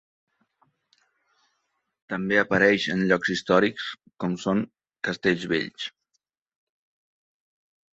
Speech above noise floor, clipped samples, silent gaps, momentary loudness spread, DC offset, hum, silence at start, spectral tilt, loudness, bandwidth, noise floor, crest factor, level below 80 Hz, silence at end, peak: 53 dB; under 0.1%; none; 15 LU; under 0.1%; none; 2.1 s; -5.5 dB/octave; -24 LUFS; 8 kHz; -77 dBFS; 24 dB; -64 dBFS; 2.05 s; -4 dBFS